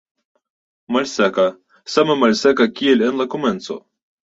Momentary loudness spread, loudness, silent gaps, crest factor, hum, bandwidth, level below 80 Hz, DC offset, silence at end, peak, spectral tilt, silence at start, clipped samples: 12 LU; -17 LUFS; none; 18 dB; none; 8 kHz; -60 dBFS; under 0.1%; 0.5 s; 0 dBFS; -4.5 dB/octave; 0.9 s; under 0.1%